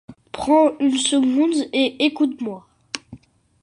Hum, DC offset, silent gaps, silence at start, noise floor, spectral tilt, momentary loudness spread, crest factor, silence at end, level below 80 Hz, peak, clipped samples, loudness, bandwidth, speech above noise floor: none; under 0.1%; none; 0.1 s; -45 dBFS; -3 dB/octave; 16 LU; 16 dB; 0.45 s; -58 dBFS; -4 dBFS; under 0.1%; -19 LUFS; 11 kHz; 27 dB